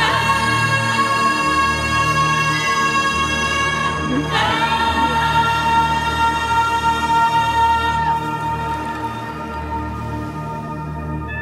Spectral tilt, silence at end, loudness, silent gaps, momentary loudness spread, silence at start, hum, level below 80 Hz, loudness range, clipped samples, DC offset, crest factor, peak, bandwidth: -4 dB/octave; 0 s; -18 LUFS; none; 11 LU; 0 s; none; -36 dBFS; 5 LU; under 0.1%; under 0.1%; 14 dB; -4 dBFS; 15.5 kHz